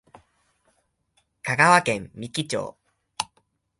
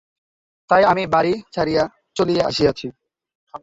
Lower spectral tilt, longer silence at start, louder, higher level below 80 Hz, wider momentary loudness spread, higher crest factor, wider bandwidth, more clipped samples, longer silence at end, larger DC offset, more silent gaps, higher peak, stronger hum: second, -3.5 dB/octave vs -5.5 dB/octave; first, 1.45 s vs 0.7 s; second, -23 LUFS vs -19 LUFS; second, -62 dBFS vs -50 dBFS; first, 18 LU vs 9 LU; first, 26 dB vs 18 dB; first, 11.5 kHz vs 7.8 kHz; neither; first, 0.55 s vs 0.05 s; neither; second, none vs 3.35-3.47 s; about the same, -2 dBFS vs -2 dBFS; neither